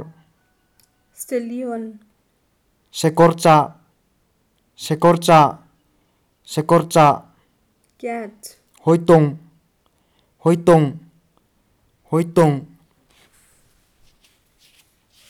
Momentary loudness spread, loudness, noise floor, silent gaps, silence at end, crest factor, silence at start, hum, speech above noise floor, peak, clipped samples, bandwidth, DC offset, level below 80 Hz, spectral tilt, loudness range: 21 LU; -17 LUFS; -64 dBFS; none; 2.65 s; 18 dB; 0 s; none; 49 dB; -2 dBFS; under 0.1%; 15.5 kHz; under 0.1%; -56 dBFS; -6.5 dB/octave; 7 LU